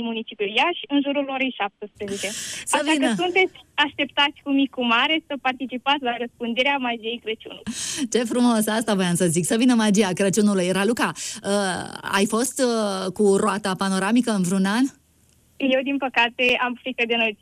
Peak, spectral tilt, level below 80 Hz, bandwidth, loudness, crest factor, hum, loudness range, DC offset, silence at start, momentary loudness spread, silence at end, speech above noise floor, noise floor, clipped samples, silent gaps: -6 dBFS; -4 dB/octave; -64 dBFS; 14.5 kHz; -22 LUFS; 16 dB; none; 3 LU; under 0.1%; 0 s; 9 LU; 0.1 s; 37 dB; -59 dBFS; under 0.1%; none